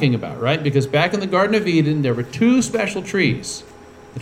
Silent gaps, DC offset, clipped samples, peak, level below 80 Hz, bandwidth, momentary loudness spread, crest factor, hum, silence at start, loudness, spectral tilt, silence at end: none; under 0.1%; under 0.1%; -2 dBFS; -52 dBFS; 14.5 kHz; 7 LU; 16 dB; none; 0 s; -19 LUFS; -5.5 dB/octave; 0 s